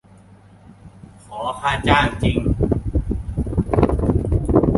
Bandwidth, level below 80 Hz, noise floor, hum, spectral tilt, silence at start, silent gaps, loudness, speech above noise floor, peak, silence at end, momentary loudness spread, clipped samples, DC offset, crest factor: 11.5 kHz; -26 dBFS; -47 dBFS; none; -7.5 dB/octave; 0.85 s; none; -20 LUFS; 28 dB; -2 dBFS; 0 s; 9 LU; under 0.1%; under 0.1%; 18 dB